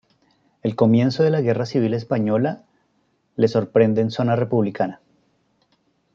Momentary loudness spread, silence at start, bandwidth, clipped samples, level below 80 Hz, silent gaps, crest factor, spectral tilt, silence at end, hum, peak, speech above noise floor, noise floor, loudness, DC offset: 9 LU; 0.65 s; 7.2 kHz; under 0.1%; -66 dBFS; none; 18 dB; -8.5 dB/octave; 1.2 s; none; -2 dBFS; 47 dB; -66 dBFS; -20 LUFS; under 0.1%